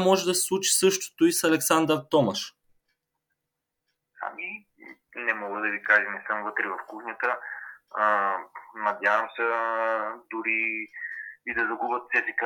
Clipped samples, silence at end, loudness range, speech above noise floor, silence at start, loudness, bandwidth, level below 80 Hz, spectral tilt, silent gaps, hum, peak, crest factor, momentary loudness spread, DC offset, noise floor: under 0.1%; 0 s; 7 LU; 58 dB; 0 s; -26 LUFS; 19.5 kHz; -74 dBFS; -2.5 dB/octave; none; none; -6 dBFS; 20 dB; 14 LU; under 0.1%; -84 dBFS